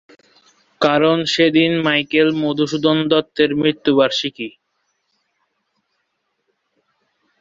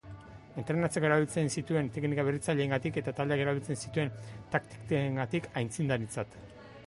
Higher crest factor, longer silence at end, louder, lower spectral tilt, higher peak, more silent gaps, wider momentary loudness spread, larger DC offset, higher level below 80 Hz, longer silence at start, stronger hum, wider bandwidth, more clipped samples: about the same, 18 dB vs 18 dB; first, 2.9 s vs 0 s; first, -16 LUFS vs -32 LUFS; about the same, -5 dB/octave vs -6 dB/octave; first, -2 dBFS vs -14 dBFS; neither; second, 6 LU vs 14 LU; neither; about the same, -60 dBFS vs -60 dBFS; first, 0.8 s vs 0.05 s; neither; second, 7.8 kHz vs 11.5 kHz; neither